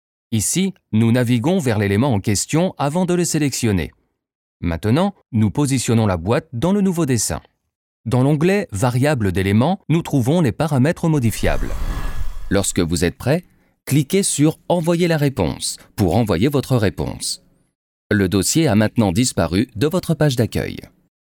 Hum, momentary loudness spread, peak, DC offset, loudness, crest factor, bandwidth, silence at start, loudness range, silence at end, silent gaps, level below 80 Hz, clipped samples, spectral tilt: none; 8 LU; -4 dBFS; under 0.1%; -18 LUFS; 14 dB; 19.5 kHz; 0.3 s; 2 LU; 0.35 s; 4.35-4.60 s, 7.75-8.04 s, 17.75-18.10 s; -34 dBFS; under 0.1%; -5.5 dB/octave